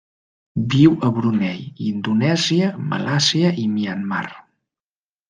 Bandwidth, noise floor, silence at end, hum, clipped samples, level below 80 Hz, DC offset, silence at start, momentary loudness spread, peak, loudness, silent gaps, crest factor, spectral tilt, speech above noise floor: 9.8 kHz; under -90 dBFS; 0.9 s; none; under 0.1%; -56 dBFS; under 0.1%; 0.55 s; 11 LU; -2 dBFS; -19 LUFS; none; 18 dB; -5.5 dB/octave; over 72 dB